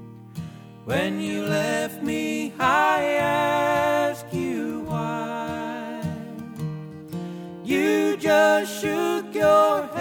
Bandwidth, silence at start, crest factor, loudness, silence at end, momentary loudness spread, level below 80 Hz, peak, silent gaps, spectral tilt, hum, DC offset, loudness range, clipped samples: 19.5 kHz; 0 s; 18 dB; -23 LUFS; 0 s; 17 LU; -60 dBFS; -6 dBFS; none; -5 dB/octave; none; under 0.1%; 8 LU; under 0.1%